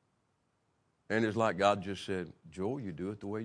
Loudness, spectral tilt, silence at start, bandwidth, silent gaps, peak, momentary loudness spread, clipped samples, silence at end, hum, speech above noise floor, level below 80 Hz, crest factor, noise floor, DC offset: -34 LUFS; -6 dB/octave; 1.1 s; 10.5 kHz; none; -14 dBFS; 11 LU; under 0.1%; 0 s; none; 43 dB; -70 dBFS; 22 dB; -77 dBFS; under 0.1%